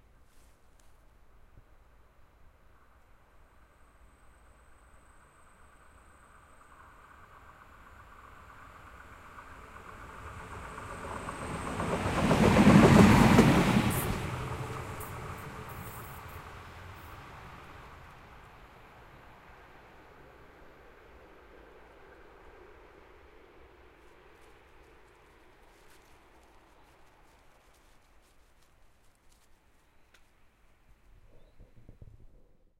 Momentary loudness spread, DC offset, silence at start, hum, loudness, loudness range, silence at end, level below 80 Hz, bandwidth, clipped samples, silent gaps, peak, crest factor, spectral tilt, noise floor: 32 LU; under 0.1%; 9.35 s; none; -26 LUFS; 28 LU; 15 s; -48 dBFS; 16 kHz; under 0.1%; none; -6 dBFS; 28 dB; -6.5 dB/octave; -62 dBFS